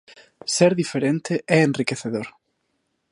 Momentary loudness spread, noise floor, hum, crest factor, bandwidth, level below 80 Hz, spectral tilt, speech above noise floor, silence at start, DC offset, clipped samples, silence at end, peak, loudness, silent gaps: 12 LU; -73 dBFS; none; 20 dB; 11.5 kHz; -68 dBFS; -5 dB/octave; 52 dB; 0.45 s; under 0.1%; under 0.1%; 0.8 s; -2 dBFS; -21 LUFS; none